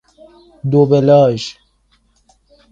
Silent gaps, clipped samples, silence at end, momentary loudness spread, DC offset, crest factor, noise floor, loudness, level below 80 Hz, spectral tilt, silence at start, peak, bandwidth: none; under 0.1%; 1.2 s; 16 LU; under 0.1%; 16 dB; -58 dBFS; -13 LUFS; -52 dBFS; -7.5 dB/octave; 0.65 s; 0 dBFS; 7.8 kHz